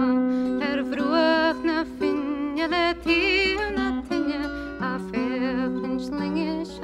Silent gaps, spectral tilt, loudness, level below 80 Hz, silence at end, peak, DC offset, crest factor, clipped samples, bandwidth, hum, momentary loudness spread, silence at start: none; -5.5 dB/octave; -24 LUFS; -46 dBFS; 0 s; -8 dBFS; under 0.1%; 16 dB; under 0.1%; 11 kHz; none; 8 LU; 0 s